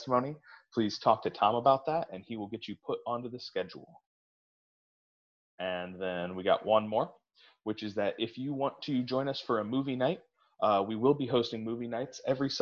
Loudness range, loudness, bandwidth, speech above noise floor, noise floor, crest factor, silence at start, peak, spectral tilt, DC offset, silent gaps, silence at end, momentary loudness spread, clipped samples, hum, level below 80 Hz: 9 LU; -32 LUFS; 7.2 kHz; over 58 dB; under -90 dBFS; 24 dB; 0 s; -10 dBFS; -6 dB/octave; under 0.1%; 4.06-5.58 s; 0 s; 12 LU; under 0.1%; none; -70 dBFS